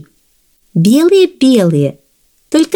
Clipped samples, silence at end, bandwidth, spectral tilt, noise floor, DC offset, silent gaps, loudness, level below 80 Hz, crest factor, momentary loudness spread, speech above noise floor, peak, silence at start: under 0.1%; 0 s; 19 kHz; -6.5 dB/octave; -55 dBFS; under 0.1%; none; -11 LUFS; -58 dBFS; 12 dB; 9 LU; 46 dB; 0 dBFS; 0.75 s